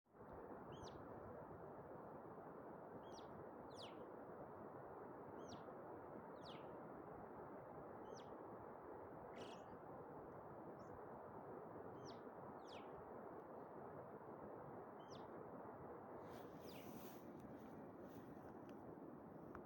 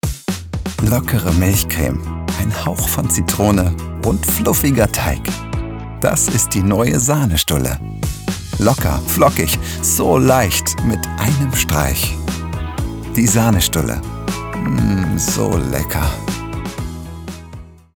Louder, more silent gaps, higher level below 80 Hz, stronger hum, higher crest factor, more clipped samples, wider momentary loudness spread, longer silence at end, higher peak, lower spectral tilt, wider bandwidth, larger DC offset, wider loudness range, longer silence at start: second, -57 LUFS vs -17 LUFS; neither; second, -80 dBFS vs -28 dBFS; neither; about the same, 16 dB vs 16 dB; neither; second, 2 LU vs 11 LU; second, 0 s vs 0.25 s; second, -40 dBFS vs 0 dBFS; first, -6 dB/octave vs -4.5 dB/octave; second, 17 kHz vs over 20 kHz; neither; about the same, 1 LU vs 3 LU; about the same, 0.05 s vs 0.05 s